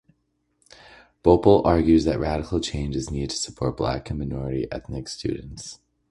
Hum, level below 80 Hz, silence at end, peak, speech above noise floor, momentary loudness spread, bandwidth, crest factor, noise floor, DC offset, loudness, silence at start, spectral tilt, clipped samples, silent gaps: none; -38 dBFS; 0.35 s; -2 dBFS; 49 dB; 15 LU; 11.5 kHz; 22 dB; -72 dBFS; under 0.1%; -23 LUFS; 1.25 s; -6 dB/octave; under 0.1%; none